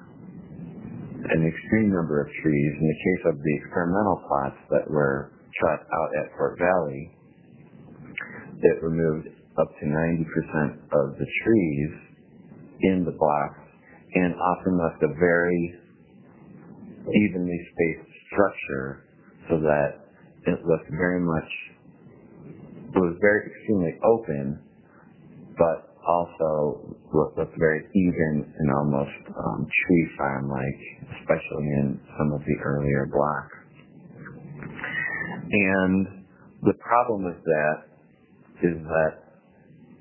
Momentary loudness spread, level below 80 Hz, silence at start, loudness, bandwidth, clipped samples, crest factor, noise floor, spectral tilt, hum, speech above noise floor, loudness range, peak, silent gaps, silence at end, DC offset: 16 LU; -50 dBFS; 0 s; -25 LUFS; 3.2 kHz; under 0.1%; 22 dB; -56 dBFS; -12 dB/octave; none; 32 dB; 3 LU; -4 dBFS; none; 0.8 s; under 0.1%